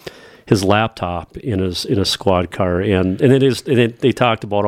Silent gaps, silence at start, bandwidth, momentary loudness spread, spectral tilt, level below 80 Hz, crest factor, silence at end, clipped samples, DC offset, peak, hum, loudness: none; 0.05 s; 16 kHz; 9 LU; -6 dB/octave; -44 dBFS; 16 dB; 0 s; under 0.1%; under 0.1%; 0 dBFS; none; -17 LUFS